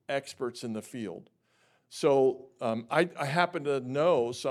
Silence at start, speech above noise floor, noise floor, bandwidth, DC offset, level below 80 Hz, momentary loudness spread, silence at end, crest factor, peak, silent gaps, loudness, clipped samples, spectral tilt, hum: 0.1 s; 40 dB; -69 dBFS; 14 kHz; under 0.1%; -82 dBFS; 14 LU; 0 s; 20 dB; -10 dBFS; none; -29 LUFS; under 0.1%; -5.5 dB/octave; none